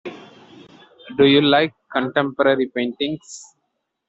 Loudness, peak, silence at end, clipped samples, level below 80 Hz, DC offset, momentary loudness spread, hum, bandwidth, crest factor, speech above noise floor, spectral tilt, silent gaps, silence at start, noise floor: -18 LUFS; -2 dBFS; 0.65 s; under 0.1%; -62 dBFS; under 0.1%; 20 LU; none; 8 kHz; 18 dB; 56 dB; -5 dB/octave; none; 0.05 s; -74 dBFS